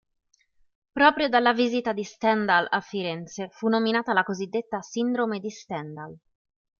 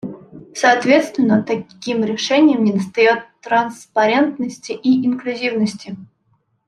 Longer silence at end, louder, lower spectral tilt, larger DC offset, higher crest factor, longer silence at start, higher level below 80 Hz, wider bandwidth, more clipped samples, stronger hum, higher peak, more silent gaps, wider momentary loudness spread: about the same, 0.65 s vs 0.65 s; second, -25 LUFS vs -17 LUFS; about the same, -4.5 dB/octave vs -5 dB/octave; neither; first, 22 dB vs 16 dB; first, 0.95 s vs 0.05 s; about the same, -66 dBFS vs -64 dBFS; second, 7.2 kHz vs 12 kHz; neither; neither; about the same, -4 dBFS vs -2 dBFS; neither; about the same, 14 LU vs 12 LU